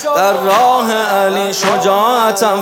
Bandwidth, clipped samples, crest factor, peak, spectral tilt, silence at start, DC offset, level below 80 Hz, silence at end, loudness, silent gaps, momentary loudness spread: 17.5 kHz; under 0.1%; 12 dB; 0 dBFS; -3 dB/octave; 0 s; under 0.1%; -64 dBFS; 0 s; -12 LUFS; none; 3 LU